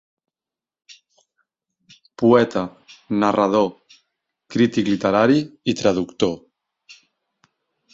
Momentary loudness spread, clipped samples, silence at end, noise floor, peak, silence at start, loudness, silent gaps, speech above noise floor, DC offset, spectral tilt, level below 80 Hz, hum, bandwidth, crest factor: 10 LU; under 0.1%; 1.55 s; -90 dBFS; -2 dBFS; 2.2 s; -19 LUFS; none; 72 dB; under 0.1%; -6 dB/octave; -58 dBFS; none; 7.8 kHz; 20 dB